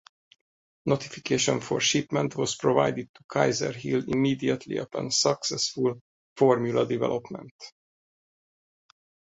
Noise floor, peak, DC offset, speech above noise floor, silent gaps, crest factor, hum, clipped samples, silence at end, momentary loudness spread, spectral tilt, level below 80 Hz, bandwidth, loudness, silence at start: under -90 dBFS; -6 dBFS; under 0.1%; over 64 dB; 3.09-3.14 s, 3.24-3.29 s, 6.01-6.36 s, 7.51-7.59 s; 22 dB; none; under 0.1%; 1.6 s; 12 LU; -4 dB/octave; -64 dBFS; 8.2 kHz; -26 LUFS; 0.85 s